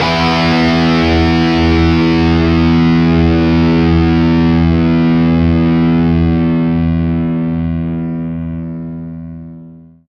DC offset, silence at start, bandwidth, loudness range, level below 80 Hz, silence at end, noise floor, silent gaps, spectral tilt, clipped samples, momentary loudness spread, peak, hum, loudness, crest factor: under 0.1%; 0 s; 6.8 kHz; 6 LU; -28 dBFS; 0.3 s; -36 dBFS; none; -8 dB/octave; under 0.1%; 12 LU; 0 dBFS; none; -12 LUFS; 12 dB